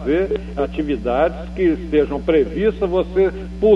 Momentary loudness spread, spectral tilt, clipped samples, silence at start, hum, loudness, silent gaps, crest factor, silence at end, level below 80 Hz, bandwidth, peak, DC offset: 5 LU; -8.5 dB/octave; under 0.1%; 0 s; 60 Hz at -30 dBFS; -19 LUFS; none; 14 dB; 0 s; -32 dBFS; 7.4 kHz; -4 dBFS; under 0.1%